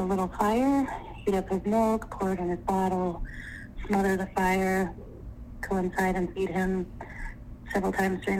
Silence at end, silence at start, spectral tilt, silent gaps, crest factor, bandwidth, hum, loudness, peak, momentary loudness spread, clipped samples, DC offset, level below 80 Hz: 0 s; 0 s; -6.5 dB/octave; none; 16 dB; 16 kHz; none; -28 LUFS; -12 dBFS; 16 LU; under 0.1%; under 0.1%; -44 dBFS